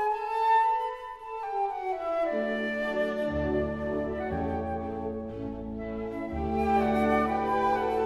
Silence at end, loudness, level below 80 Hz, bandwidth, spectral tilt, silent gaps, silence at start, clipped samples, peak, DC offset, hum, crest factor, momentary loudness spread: 0 s; -29 LUFS; -46 dBFS; 13 kHz; -7.5 dB/octave; none; 0 s; under 0.1%; -12 dBFS; under 0.1%; none; 16 dB; 11 LU